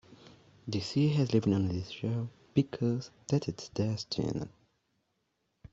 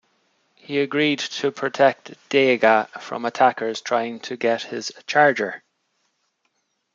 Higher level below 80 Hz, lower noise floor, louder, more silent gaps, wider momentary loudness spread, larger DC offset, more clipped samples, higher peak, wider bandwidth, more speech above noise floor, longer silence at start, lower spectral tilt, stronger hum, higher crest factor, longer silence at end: first, -64 dBFS vs -76 dBFS; first, -79 dBFS vs -71 dBFS; second, -32 LUFS vs -21 LUFS; neither; about the same, 10 LU vs 12 LU; neither; neither; second, -14 dBFS vs -2 dBFS; about the same, 8 kHz vs 7.6 kHz; about the same, 48 dB vs 51 dB; second, 0.1 s vs 0.7 s; first, -7 dB/octave vs -4 dB/octave; neither; about the same, 20 dB vs 20 dB; about the same, 1.25 s vs 1.35 s